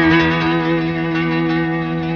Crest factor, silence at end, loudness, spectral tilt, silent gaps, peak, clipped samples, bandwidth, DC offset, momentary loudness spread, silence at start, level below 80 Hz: 14 dB; 0 s; -17 LUFS; -7.5 dB/octave; none; -2 dBFS; under 0.1%; 6.6 kHz; under 0.1%; 5 LU; 0 s; -42 dBFS